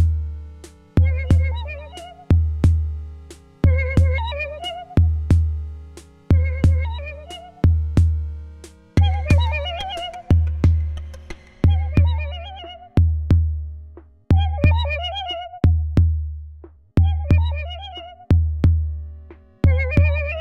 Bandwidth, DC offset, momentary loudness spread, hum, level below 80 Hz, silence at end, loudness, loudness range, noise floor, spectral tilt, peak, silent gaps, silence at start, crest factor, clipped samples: 6.2 kHz; under 0.1%; 18 LU; none; -26 dBFS; 0 s; -20 LUFS; 1 LU; -42 dBFS; -7.5 dB/octave; -4 dBFS; none; 0 s; 16 dB; under 0.1%